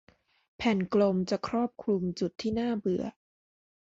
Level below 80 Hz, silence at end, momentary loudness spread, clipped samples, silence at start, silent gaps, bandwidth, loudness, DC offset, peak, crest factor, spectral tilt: -60 dBFS; 0.85 s; 7 LU; under 0.1%; 0.6 s; none; 7.8 kHz; -30 LUFS; under 0.1%; -14 dBFS; 18 dB; -7 dB/octave